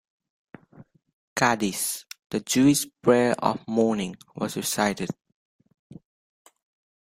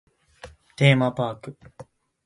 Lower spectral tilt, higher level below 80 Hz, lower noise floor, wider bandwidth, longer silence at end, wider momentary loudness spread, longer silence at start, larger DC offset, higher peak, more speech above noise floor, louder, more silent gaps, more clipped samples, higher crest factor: second, -4 dB/octave vs -6.5 dB/octave; about the same, -62 dBFS vs -58 dBFS; first, -53 dBFS vs -47 dBFS; first, 16 kHz vs 11 kHz; first, 1.9 s vs 0.45 s; second, 13 LU vs 24 LU; first, 0.8 s vs 0.45 s; neither; about the same, -4 dBFS vs -2 dBFS; first, 29 dB vs 25 dB; second, -24 LUFS vs -21 LUFS; first, 1.13-1.36 s, 2.24-2.30 s vs none; neither; about the same, 22 dB vs 22 dB